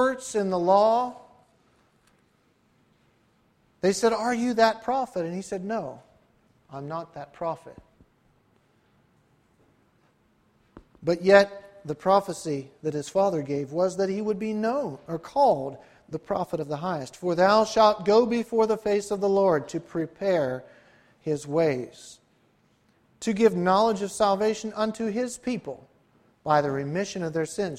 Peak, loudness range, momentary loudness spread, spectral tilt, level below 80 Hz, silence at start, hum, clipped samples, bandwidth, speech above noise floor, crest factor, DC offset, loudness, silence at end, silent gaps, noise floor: -6 dBFS; 12 LU; 15 LU; -5.5 dB/octave; -62 dBFS; 0 s; none; under 0.1%; 14.5 kHz; 41 dB; 22 dB; under 0.1%; -25 LUFS; 0 s; none; -66 dBFS